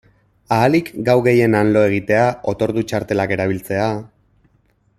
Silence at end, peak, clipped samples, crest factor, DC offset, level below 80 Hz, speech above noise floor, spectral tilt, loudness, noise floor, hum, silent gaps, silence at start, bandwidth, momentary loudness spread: 0.9 s; 0 dBFS; under 0.1%; 16 dB; under 0.1%; -50 dBFS; 43 dB; -7 dB/octave; -17 LUFS; -60 dBFS; none; none; 0.5 s; 15.5 kHz; 7 LU